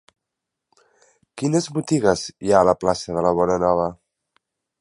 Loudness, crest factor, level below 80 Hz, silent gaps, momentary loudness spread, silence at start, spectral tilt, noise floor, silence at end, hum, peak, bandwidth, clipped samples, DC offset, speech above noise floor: -20 LUFS; 20 dB; -50 dBFS; none; 7 LU; 1.35 s; -5.5 dB/octave; -83 dBFS; 0.9 s; none; -2 dBFS; 11.5 kHz; under 0.1%; under 0.1%; 63 dB